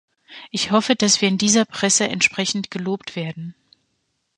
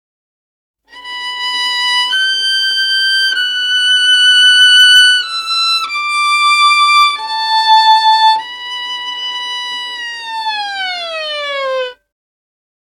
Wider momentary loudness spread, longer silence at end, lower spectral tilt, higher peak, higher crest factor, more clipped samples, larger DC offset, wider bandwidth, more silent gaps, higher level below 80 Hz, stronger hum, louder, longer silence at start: about the same, 13 LU vs 15 LU; second, 0.85 s vs 1.05 s; first, -2.5 dB/octave vs 4 dB/octave; about the same, -2 dBFS vs 0 dBFS; first, 20 dB vs 12 dB; neither; neither; second, 11 kHz vs 19 kHz; neither; about the same, -64 dBFS vs -60 dBFS; neither; second, -19 LUFS vs -10 LUFS; second, 0.3 s vs 0.95 s